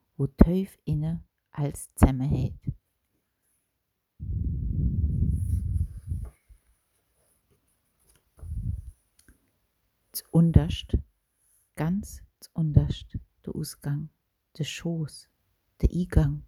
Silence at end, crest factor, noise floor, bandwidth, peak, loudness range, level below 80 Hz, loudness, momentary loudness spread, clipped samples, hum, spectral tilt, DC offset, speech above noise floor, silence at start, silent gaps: 0.05 s; 28 dB; -79 dBFS; 16 kHz; 0 dBFS; 14 LU; -34 dBFS; -28 LUFS; 18 LU; under 0.1%; none; -7.5 dB/octave; under 0.1%; 54 dB; 0.2 s; none